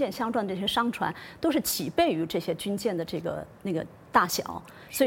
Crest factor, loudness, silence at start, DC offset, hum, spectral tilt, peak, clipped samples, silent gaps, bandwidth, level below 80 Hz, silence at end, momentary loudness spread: 22 dB; -28 LUFS; 0 s; under 0.1%; none; -4 dB/octave; -6 dBFS; under 0.1%; none; 17 kHz; -58 dBFS; 0 s; 9 LU